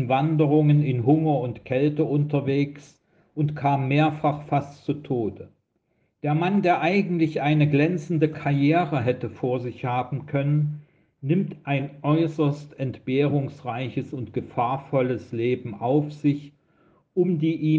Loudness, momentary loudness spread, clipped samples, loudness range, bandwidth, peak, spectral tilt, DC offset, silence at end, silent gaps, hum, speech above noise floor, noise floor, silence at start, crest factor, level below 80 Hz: -24 LUFS; 10 LU; under 0.1%; 4 LU; 7 kHz; -8 dBFS; -9 dB/octave; under 0.1%; 0 s; none; none; 47 dB; -70 dBFS; 0 s; 16 dB; -64 dBFS